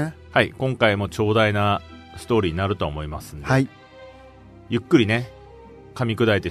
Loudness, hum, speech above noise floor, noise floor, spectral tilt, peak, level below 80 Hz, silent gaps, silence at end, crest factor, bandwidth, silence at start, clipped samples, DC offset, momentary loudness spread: -22 LUFS; none; 24 dB; -45 dBFS; -6.5 dB/octave; -2 dBFS; -44 dBFS; none; 0 s; 20 dB; 13.5 kHz; 0 s; under 0.1%; under 0.1%; 14 LU